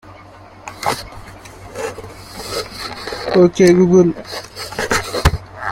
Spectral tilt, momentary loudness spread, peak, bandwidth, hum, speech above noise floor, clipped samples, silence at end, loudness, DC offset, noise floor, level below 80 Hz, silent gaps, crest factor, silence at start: -5.5 dB/octave; 24 LU; 0 dBFS; 16.5 kHz; none; 28 dB; under 0.1%; 0 s; -17 LUFS; under 0.1%; -40 dBFS; -34 dBFS; none; 18 dB; 0.05 s